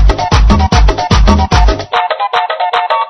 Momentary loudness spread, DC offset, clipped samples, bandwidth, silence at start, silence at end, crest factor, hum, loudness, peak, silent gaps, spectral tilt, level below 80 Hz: 4 LU; under 0.1%; 1%; 6.6 kHz; 0 s; 0 s; 10 dB; none; -11 LUFS; 0 dBFS; none; -5.5 dB/octave; -12 dBFS